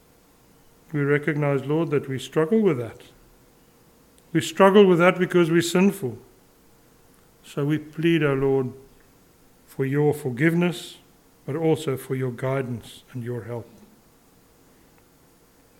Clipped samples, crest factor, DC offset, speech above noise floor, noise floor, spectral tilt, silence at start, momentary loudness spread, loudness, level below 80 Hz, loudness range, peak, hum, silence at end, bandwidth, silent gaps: under 0.1%; 22 dB; under 0.1%; 35 dB; -57 dBFS; -6.5 dB/octave; 0.9 s; 17 LU; -22 LUFS; -60 dBFS; 8 LU; -2 dBFS; none; 2.15 s; 17 kHz; none